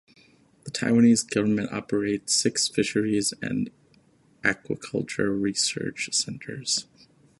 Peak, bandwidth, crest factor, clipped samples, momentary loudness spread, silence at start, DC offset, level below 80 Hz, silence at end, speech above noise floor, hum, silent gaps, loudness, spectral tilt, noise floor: -4 dBFS; 11.5 kHz; 22 dB; under 0.1%; 11 LU; 0.65 s; under 0.1%; -62 dBFS; 0.55 s; 35 dB; none; none; -25 LUFS; -3.5 dB/octave; -60 dBFS